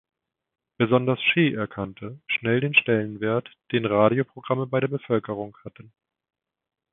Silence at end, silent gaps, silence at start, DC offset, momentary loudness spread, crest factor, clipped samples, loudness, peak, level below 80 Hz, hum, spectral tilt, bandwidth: 1.25 s; none; 0.8 s; under 0.1%; 14 LU; 22 dB; under 0.1%; -23 LUFS; -4 dBFS; -62 dBFS; none; -10.5 dB/octave; 4 kHz